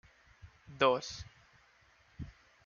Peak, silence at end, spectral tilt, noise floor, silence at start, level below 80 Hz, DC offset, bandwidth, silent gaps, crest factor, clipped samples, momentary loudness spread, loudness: -14 dBFS; 0.35 s; -4 dB/octave; -66 dBFS; 0.45 s; -62 dBFS; under 0.1%; 7.2 kHz; none; 24 dB; under 0.1%; 23 LU; -32 LUFS